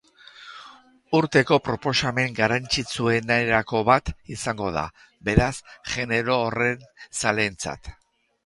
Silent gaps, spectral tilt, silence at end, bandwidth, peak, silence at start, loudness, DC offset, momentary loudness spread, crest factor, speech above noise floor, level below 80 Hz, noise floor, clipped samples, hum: none; -4.5 dB/octave; 0.5 s; 11.5 kHz; -2 dBFS; 0.4 s; -23 LUFS; under 0.1%; 15 LU; 24 dB; 26 dB; -42 dBFS; -50 dBFS; under 0.1%; none